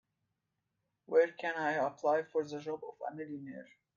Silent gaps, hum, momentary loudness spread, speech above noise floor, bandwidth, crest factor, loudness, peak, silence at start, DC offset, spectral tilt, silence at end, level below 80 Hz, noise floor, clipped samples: none; none; 14 LU; 50 dB; 7.2 kHz; 20 dB; -35 LUFS; -16 dBFS; 1.1 s; under 0.1%; -5.5 dB/octave; 0.35 s; -86 dBFS; -85 dBFS; under 0.1%